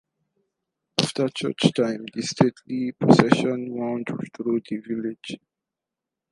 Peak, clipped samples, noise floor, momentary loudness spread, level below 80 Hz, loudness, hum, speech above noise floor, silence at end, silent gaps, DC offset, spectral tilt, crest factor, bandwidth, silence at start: 0 dBFS; under 0.1%; -87 dBFS; 13 LU; -60 dBFS; -23 LUFS; none; 64 dB; 0.95 s; none; under 0.1%; -5.5 dB/octave; 24 dB; 11.5 kHz; 1 s